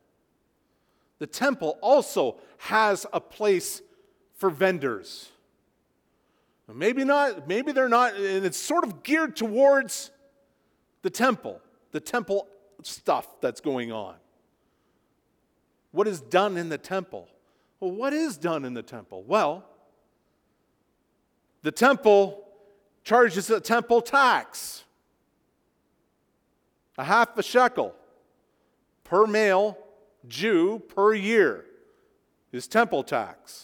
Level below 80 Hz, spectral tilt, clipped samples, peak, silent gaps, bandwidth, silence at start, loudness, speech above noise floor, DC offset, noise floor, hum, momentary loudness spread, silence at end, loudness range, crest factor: -74 dBFS; -4 dB/octave; under 0.1%; -6 dBFS; none; 19.5 kHz; 1.2 s; -24 LUFS; 47 dB; under 0.1%; -71 dBFS; none; 18 LU; 0 s; 7 LU; 22 dB